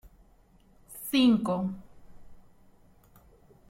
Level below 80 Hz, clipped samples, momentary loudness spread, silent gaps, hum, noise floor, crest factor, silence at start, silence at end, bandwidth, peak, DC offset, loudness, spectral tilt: -60 dBFS; under 0.1%; 22 LU; none; none; -60 dBFS; 18 dB; 0.05 s; 1.3 s; 16.5 kHz; -14 dBFS; under 0.1%; -27 LUFS; -5.5 dB/octave